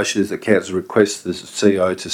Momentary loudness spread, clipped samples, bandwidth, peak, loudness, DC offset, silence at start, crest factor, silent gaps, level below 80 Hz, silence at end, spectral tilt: 6 LU; under 0.1%; 16 kHz; 0 dBFS; -18 LUFS; under 0.1%; 0 s; 18 dB; none; -58 dBFS; 0 s; -4.5 dB/octave